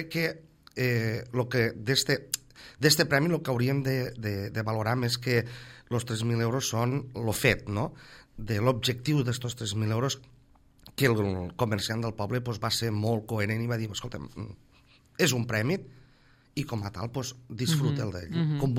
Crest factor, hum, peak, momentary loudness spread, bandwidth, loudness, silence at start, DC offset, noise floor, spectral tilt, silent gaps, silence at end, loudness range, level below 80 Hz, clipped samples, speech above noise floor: 22 dB; none; -8 dBFS; 11 LU; 16 kHz; -29 LUFS; 0 s; under 0.1%; -60 dBFS; -5 dB/octave; none; 0 s; 5 LU; -56 dBFS; under 0.1%; 32 dB